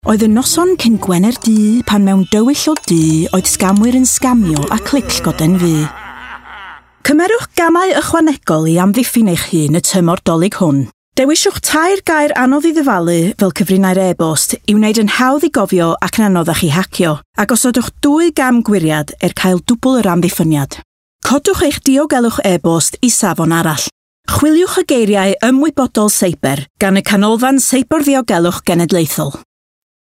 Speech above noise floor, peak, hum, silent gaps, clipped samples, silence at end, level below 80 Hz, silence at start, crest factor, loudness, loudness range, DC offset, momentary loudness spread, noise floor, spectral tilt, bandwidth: 22 dB; 0 dBFS; none; 10.94-11.12 s, 17.25-17.33 s, 20.85-21.19 s, 23.92-24.24 s, 26.70-26.75 s; under 0.1%; 0.6 s; -40 dBFS; 0.05 s; 12 dB; -12 LUFS; 2 LU; under 0.1%; 5 LU; -33 dBFS; -4.5 dB/octave; 16.5 kHz